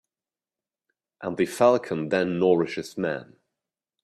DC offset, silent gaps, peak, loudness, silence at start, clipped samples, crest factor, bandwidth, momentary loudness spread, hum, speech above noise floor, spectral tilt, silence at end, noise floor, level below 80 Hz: under 0.1%; none; -6 dBFS; -24 LUFS; 1.2 s; under 0.1%; 20 dB; 14 kHz; 12 LU; none; over 66 dB; -6 dB/octave; 0.8 s; under -90 dBFS; -68 dBFS